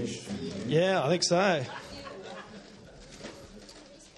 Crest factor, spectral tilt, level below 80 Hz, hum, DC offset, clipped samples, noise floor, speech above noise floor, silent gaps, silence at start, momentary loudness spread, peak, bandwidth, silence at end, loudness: 18 dB; -4.5 dB/octave; -62 dBFS; none; under 0.1%; under 0.1%; -51 dBFS; 24 dB; none; 0 s; 24 LU; -14 dBFS; 12 kHz; 0.1 s; -28 LUFS